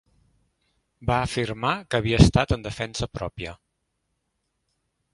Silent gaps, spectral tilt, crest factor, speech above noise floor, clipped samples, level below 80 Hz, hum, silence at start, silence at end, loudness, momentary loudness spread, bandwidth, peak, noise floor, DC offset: none; -6 dB/octave; 26 dB; 53 dB; under 0.1%; -36 dBFS; none; 1 s; 1.6 s; -24 LUFS; 15 LU; 11.5 kHz; 0 dBFS; -76 dBFS; under 0.1%